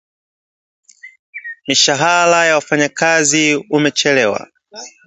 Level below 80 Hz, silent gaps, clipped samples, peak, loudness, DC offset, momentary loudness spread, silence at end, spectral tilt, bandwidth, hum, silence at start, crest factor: -64 dBFS; 1.19-1.33 s; under 0.1%; 0 dBFS; -13 LUFS; under 0.1%; 19 LU; 0.2 s; -2.5 dB/octave; 8.4 kHz; none; 1.05 s; 16 dB